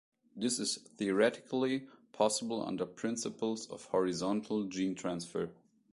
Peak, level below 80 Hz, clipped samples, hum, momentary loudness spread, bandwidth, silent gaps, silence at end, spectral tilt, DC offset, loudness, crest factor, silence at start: -16 dBFS; -74 dBFS; under 0.1%; none; 8 LU; 11.5 kHz; none; 0.4 s; -4 dB/octave; under 0.1%; -35 LUFS; 20 dB; 0.35 s